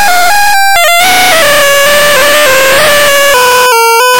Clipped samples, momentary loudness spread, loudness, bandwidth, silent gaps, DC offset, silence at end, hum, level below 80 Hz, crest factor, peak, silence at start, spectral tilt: under 0.1%; 1 LU; -4 LUFS; 17.5 kHz; none; 10%; 0 s; none; -36 dBFS; 6 dB; 0 dBFS; 0 s; 0 dB/octave